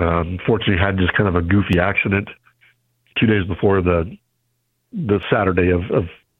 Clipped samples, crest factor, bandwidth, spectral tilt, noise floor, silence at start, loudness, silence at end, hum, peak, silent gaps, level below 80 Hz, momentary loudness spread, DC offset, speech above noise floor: under 0.1%; 18 dB; 4.1 kHz; -9 dB/octave; -69 dBFS; 0 s; -18 LUFS; 0.25 s; none; 0 dBFS; none; -38 dBFS; 6 LU; under 0.1%; 52 dB